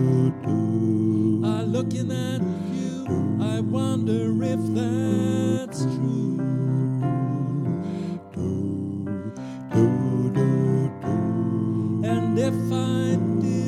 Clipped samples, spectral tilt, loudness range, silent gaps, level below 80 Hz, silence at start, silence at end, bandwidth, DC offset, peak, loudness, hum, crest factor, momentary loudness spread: under 0.1%; -8 dB/octave; 3 LU; none; -60 dBFS; 0 s; 0 s; 12 kHz; under 0.1%; -6 dBFS; -24 LUFS; none; 16 dB; 7 LU